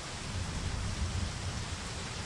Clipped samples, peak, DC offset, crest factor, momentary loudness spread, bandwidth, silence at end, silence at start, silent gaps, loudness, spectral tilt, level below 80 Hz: under 0.1%; -22 dBFS; under 0.1%; 14 dB; 3 LU; 11.5 kHz; 0 s; 0 s; none; -37 LUFS; -4 dB/octave; -42 dBFS